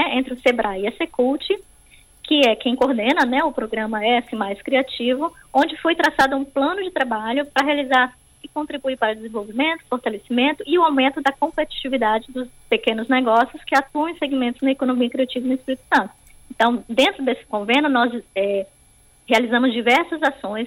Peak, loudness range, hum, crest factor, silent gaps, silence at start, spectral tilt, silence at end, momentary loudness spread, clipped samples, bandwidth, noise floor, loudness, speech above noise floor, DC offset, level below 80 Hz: -4 dBFS; 2 LU; none; 16 dB; none; 0 s; -4 dB/octave; 0 s; 8 LU; under 0.1%; 16 kHz; -53 dBFS; -20 LUFS; 33 dB; under 0.1%; -54 dBFS